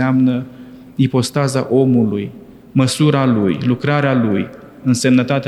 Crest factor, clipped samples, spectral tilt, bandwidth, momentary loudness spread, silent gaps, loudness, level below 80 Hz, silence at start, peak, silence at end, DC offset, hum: 14 dB; under 0.1%; -6.5 dB/octave; 12.5 kHz; 10 LU; none; -16 LUFS; -54 dBFS; 0 s; -2 dBFS; 0 s; under 0.1%; none